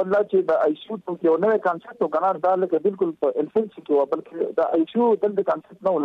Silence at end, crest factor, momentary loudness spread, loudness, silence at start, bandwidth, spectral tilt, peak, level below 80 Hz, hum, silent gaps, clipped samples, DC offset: 0 s; 12 dB; 6 LU; -22 LUFS; 0 s; 5.4 kHz; -8.5 dB/octave; -10 dBFS; -70 dBFS; none; none; under 0.1%; under 0.1%